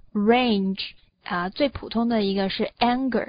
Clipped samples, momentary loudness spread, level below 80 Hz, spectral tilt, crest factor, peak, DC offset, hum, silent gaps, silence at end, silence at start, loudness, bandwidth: under 0.1%; 11 LU; -50 dBFS; -10.5 dB/octave; 18 dB; -6 dBFS; under 0.1%; none; none; 0.05 s; 0.15 s; -24 LUFS; 5.2 kHz